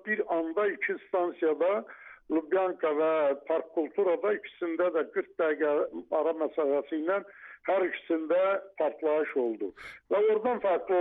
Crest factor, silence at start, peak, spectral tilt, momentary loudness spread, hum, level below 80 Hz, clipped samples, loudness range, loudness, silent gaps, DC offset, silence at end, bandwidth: 12 dB; 0.05 s; -16 dBFS; -3 dB/octave; 6 LU; none; -74 dBFS; under 0.1%; 1 LU; -29 LUFS; none; under 0.1%; 0 s; 4.5 kHz